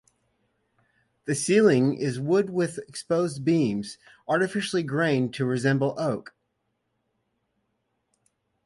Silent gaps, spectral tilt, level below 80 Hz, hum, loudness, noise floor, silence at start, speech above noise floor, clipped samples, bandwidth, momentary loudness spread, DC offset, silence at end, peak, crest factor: none; -5.5 dB/octave; -68 dBFS; none; -25 LUFS; -76 dBFS; 1.25 s; 52 dB; under 0.1%; 11.5 kHz; 12 LU; under 0.1%; 2.45 s; -8 dBFS; 18 dB